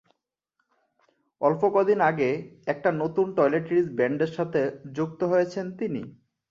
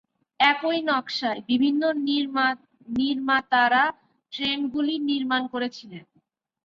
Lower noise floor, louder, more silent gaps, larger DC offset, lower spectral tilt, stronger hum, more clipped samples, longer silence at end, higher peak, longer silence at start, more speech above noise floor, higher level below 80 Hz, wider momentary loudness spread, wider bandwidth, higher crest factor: first, -78 dBFS vs -68 dBFS; about the same, -25 LUFS vs -24 LUFS; neither; neither; first, -8 dB/octave vs -4.5 dB/octave; neither; neither; second, 0.4 s vs 0.65 s; about the same, -8 dBFS vs -8 dBFS; first, 1.4 s vs 0.4 s; first, 53 dB vs 44 dB; about the same, -68 dBFS vs -68 dBFS; about the same, 10 LU vs 11 LU; about the same, 7.4 kHz vs 7.2 kHz; about the same, 18 dB vs 18 dB